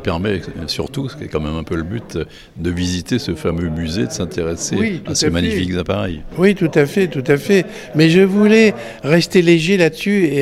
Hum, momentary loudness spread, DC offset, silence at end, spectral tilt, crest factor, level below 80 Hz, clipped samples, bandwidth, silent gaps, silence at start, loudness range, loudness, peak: none; 12 LU; under 0.1%; 0 s; -5.5 dB/octave; 16 dB; -38 dBFS; under 0.1%; 15.5 kHz; none; 0 s; 9 LU; -16 LUFS; 0 dBFS